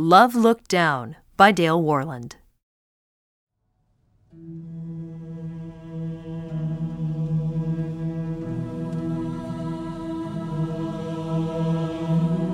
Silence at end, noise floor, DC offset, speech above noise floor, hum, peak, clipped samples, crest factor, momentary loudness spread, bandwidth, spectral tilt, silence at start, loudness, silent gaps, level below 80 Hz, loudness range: 0 s; -69 dBFS; under 0.1%; 50 dB; none; 0 dBFS; under 0.1%; 24 dB; 19 LU; 16 kHz; -6.5 dB/octave; 0 s; -24 LUFS; 2.63-3.47 s; -52 dBFS; 16 LU